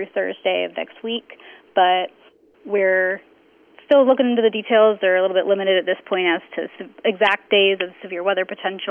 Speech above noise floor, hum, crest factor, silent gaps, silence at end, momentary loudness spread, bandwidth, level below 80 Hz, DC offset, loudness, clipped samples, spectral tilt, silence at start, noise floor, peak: 34 dB; none; 14 dB; none; 0 s; 12 LU; 3.6 kHz; -78 dBFS; under 0.1%; -19 LUFS; under 0.1%; -6 dB/octave; 0 s; -53 dBFS; -4 dBFS